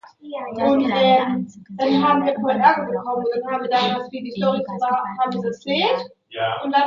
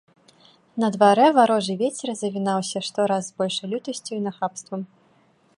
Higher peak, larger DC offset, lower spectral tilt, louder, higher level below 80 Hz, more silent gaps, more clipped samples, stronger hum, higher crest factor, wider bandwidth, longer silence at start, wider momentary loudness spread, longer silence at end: about the same, -2 dBFS vs -2 dBFS; neither; first, -6.5 dB/octave vs -4.5 dB/octave; about the same, -20 LUFS vs -22 LUFS; first, -64 dBFS vs -74 dBFS; neither; neither; neither; about the same, 18 dB vs 20 dB; second, 7.4 kHz vs 11 kHz; second, 0.25 s vs 0.75 s; second, 11 LU vs 16 LU; second, 0 s vs 0.75 s